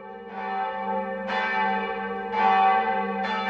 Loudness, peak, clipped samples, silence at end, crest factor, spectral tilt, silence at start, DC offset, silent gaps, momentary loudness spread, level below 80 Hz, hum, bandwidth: -25 LUFS; -10 dBFS; under 0.1%; 0 s; 16 dB; -6 dB/octave; 0 s; under 0.1%; none; 10 LU; -62 dBFS; none; 7 kHz